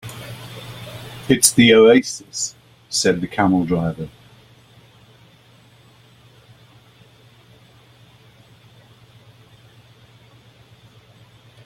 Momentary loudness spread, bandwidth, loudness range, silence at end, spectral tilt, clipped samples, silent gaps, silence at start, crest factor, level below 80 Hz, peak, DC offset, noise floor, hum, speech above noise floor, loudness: 24 LU; 16.5 kHz; 12 LU; 7.6 s; -4 dB/octave; under 0.1%; none; 0.05 s; 22 dB; -54 dBFS; 0 dBFS; under 0.1%; -50 dBFS; none; 35 dB; -16 LUFS